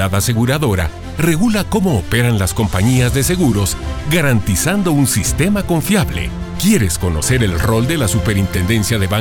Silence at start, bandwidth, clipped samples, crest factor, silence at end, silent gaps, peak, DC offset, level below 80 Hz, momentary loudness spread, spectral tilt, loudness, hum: 0 s; 18.5 kHz; under 0.1%; 14 dB; 0 s; none; 0 dBFS; under 0.1%; -28 dBFS; 4 LU; -5 dB/octave; -15 LUFS; none